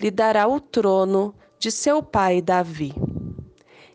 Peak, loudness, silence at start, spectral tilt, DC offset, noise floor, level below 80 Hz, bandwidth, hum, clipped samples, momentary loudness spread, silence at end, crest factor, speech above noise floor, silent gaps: -6 dBFS; -21 LUFS; 0 s; -5 dB/octave; under 0.1%; -50 dBFS; -50 dBFS; 10 kHz; none; under 0.1%; 10 LU; 0.5 s; 16 dB; 30 dB; none